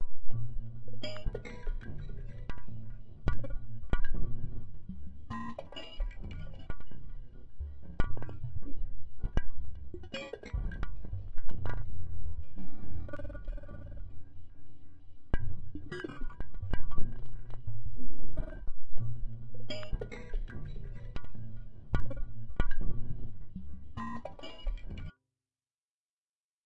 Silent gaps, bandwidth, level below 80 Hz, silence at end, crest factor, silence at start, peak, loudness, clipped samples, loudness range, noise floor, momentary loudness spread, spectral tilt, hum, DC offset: 25.75-26.64 s; 5.4 kHz; -38 dBFS; 0 s; 16 dB; 0 s; -10 dBFS; -43 LUFS; under 0.1%; 4 LU; under -90 dBFS; 10 LU; -7 dB/octave; none; under 0.1%